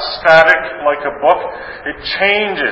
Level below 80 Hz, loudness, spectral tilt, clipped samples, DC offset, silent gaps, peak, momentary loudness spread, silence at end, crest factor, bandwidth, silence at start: -46 dBFS; -12 LUFS; -4.5 dB/octave; 0.3%; under 0.1%; none; 0 dBFS; 16 LU; 0 s; 14 dB; 8 kHz; 0 s